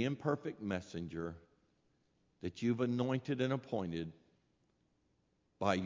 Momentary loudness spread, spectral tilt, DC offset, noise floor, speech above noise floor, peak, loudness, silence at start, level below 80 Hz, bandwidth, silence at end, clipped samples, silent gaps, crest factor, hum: 12 LU; -7 dB/octave; under 0.1%; -78 dBFS; 40 dB; -18 dBFS; -39 LUFS; 0 s; -64 dBFS; 7.6 kHz; 0 s; under 0.1%; none; 22 dB; none